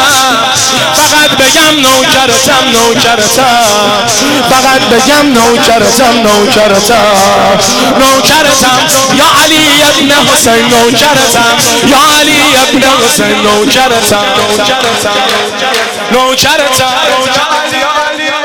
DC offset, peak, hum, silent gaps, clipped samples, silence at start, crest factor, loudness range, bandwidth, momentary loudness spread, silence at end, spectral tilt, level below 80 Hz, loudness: under 0.1%; 0 dBFS; none; none; under 0.1%; 0 s; 6 dB; 3 LU; 17.5 kHz; 4 LU; 0 s; -2 dB/octave; -36 dBFS; -5 LUFS